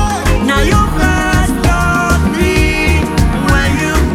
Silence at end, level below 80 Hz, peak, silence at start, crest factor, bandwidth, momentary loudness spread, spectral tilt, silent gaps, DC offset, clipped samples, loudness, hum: 0 s; -16 dBFS; 0 dBFS; 0 s; 12 dB; 16.5 kHz; 2 LU; -5.5 dB/octave; none; under 0.1%; under 0.1%; -12 LUFS; none